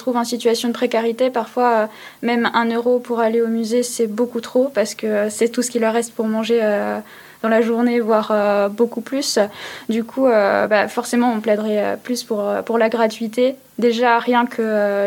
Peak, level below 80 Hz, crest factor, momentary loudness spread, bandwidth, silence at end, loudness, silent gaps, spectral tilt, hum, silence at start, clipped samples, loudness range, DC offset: 0 dBFS; -70 dBFS; 18 dB; 6 LU; 18.5 kHz; 0 s; -18 LUFS; none; -4 dB/octave; none; 0 s; under 0.1%; 1 LU; under 0.1%